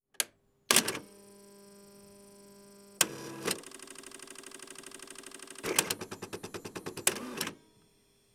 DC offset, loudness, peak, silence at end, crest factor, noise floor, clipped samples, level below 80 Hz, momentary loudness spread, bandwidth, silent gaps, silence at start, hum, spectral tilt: under 0.1%; -32 LUFS; -4 dBFS; 0.8 s; 32 dB; -67 dBFS; under 0.1%; -74 dBFS; 26 LU; over 20 kHz; none; 0.2 s; none; -1 dB/octave